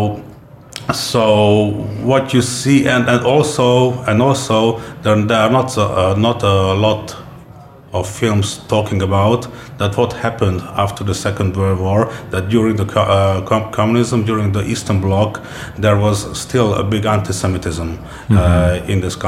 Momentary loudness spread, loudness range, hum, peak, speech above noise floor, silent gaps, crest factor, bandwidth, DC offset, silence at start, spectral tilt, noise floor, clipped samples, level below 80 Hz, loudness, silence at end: 9 LU; 4 LU; none; 0 dBFS; 23 dB; none; 14 dB; 15 kHz; under 0.1%; 0 s; -6 dB/octave; -38 dBFS; under 0.1%; -36 dBFS; -15 LUFS; 0 s